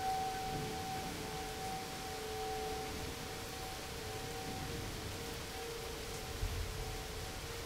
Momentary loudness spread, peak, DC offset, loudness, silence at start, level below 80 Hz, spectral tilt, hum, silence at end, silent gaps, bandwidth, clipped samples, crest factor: 3 LU; -26 dBFS; under 0.1%; -42 LUFS; 0 s; -50 dBFS; -3.5 dB/octave; none; 0 s; none; 16 kHz; under 0.1%; 16 dB